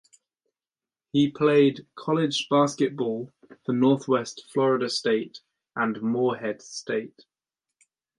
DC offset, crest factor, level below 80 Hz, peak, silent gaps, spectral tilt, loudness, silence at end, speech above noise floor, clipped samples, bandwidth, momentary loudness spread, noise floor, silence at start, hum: under 0.1%; 18 dB; -72 dBFS; -8 dBFS; none; -5.5 dB/octave; -25 LUFS; 1.1 s; over 66 dB; under 0.1%; 11 kHz; 14 LU; under -90 dBFS; 1.15 s; none